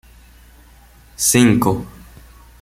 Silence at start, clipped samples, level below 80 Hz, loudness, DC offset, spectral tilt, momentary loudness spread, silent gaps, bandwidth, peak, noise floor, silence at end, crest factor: 1.2 s; under 0.1%; -44 dBFS; -15 LUFS; under 0.1%; -4 dB/octave; 15 LU; none; 16.5 kHz; -2 dBFS; -46 dBFS; 0.75 s; 18 dB